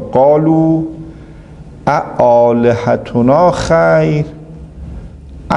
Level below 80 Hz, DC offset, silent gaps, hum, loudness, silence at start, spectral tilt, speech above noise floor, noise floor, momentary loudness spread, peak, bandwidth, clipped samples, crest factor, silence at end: -36 dBFS; under 0.1%; none; none; -11 LUFS; 0 s; -7.5 dB/octave; 23 dB; -33 dBFS; 22 LU; 0 dBFS; 10.5 kHz; under 0.1%; 12 dB; 0 s